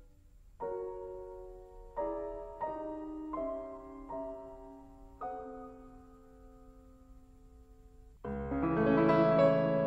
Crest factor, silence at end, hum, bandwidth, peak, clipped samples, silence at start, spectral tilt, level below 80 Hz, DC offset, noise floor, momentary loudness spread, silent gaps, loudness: 20 dB; 0 s; none; 7.8 kHz; -16 dBFS; under 0.1%; 0 s; -9 dB/octave; -54 dBFS; under 0.1%; -58 dBFS; 24 LU; none; -34 LUFS